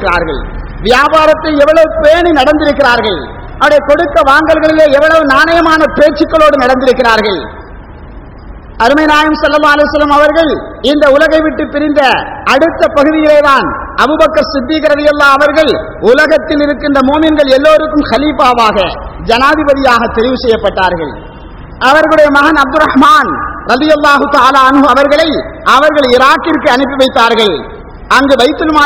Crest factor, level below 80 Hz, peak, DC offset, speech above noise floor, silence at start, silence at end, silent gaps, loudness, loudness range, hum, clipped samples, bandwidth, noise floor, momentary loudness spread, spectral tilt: 8 dB; -28 dBFS; 0 dBFS; 0.4%; 21 dB; 0 s; 0 s; none; -7 LUFS; 3 LU; none; 6%; 17 kHz; -28 dBFS; 7 LU; -4.5 dB/octave